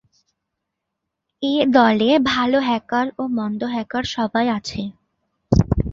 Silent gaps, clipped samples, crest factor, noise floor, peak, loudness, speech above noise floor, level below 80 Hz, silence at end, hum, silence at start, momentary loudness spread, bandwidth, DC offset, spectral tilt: none; under 0.1%; 18 dB; -80 dBFS; -2 dBFS; -19 LUFS; 61 dB; -36 dBFS; 0 s; none; 1.4 s; 10 LU; 7.6 kHz; under 0.1%; -6.5 dB/octave